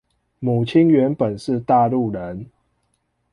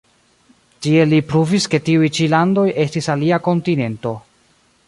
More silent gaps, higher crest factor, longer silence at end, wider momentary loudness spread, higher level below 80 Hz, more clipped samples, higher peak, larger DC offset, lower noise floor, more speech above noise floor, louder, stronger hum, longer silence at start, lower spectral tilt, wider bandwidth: neither; about the same, 16 dB vs 16 dB; first, 0.9 s vs 0.7 s; first, 14 LU vs 10 LU; about the same, -54 dBFS vs -56 dBFS; neither; about the same, -4 dBFS vs -2 dBFS; neither; first, -69 dBFS vs -57 dBFS; first, 51 dB vs 41 dB; second, -19 LUFS vs -16 LUFS; neither; second, 0.4 s vs 0.8 s; first, -8.5 dB/octave vs -6 dB/octave; about the same, 11 kHz vs 11.5 kHz